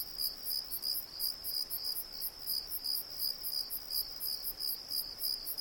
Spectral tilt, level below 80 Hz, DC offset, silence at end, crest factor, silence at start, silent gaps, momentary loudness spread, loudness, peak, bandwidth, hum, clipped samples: 0.5 dB/octave; -62 dBFS; under 0.1%; 0 s; 18 dB; 0 s; none; 3 LU; -35 LUFS; -20 dBFS; 18 kHz; none; under 0.1%